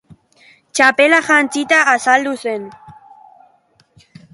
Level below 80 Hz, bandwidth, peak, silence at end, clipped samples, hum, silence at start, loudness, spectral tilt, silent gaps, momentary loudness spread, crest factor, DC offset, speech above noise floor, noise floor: -64 dBFS; 11.5 kHz; 0 dBFS; 1.4 s; under 0.1%; none; 0.75 s; -13 LUFS; -2 dB/octave; none; 14 LU; 18 dB; under 0.1%; 42 dB; -56 dBFS